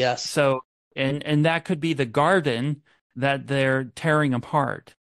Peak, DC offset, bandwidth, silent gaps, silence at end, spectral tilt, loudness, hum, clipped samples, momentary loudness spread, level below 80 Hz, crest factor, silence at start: -6 dBFS; under 0.1%; 12.5 kHz; 0.65-0.91 s, 3.01-3.10 s; 0.2 s; -5.5 dB/octave; -23 LUFS; none; under 0.1%; 8 LU; -62 dBFS; 16 dB; 0 s